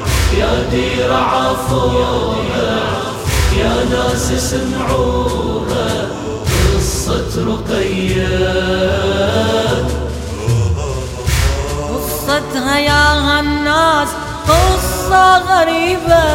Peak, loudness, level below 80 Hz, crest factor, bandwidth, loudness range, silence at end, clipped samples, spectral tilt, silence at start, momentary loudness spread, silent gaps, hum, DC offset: 0 dBFS; -14 LUFS; -22 dBFS; 14 dB; 16.5 kHz; 5 LU; 0 s; under 0.1%; -4.5 dB/octave; 0 s; 8 LU; none; none; under 0.1%